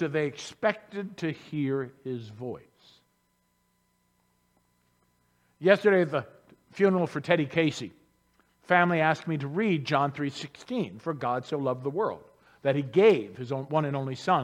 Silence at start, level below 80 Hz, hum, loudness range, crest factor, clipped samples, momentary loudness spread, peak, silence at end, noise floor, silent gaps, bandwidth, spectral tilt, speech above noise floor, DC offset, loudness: 0 s; -72 dBFS; 60 Hz at -60 dBFS; 11 LU; 22 dB; under 0.1%; 16 LU; -6 dBFS; 0 s; -72 dBFS; none; 11 kHz; -6.5 dB/octave; 45 dB; under 0.1%; -28 LUFS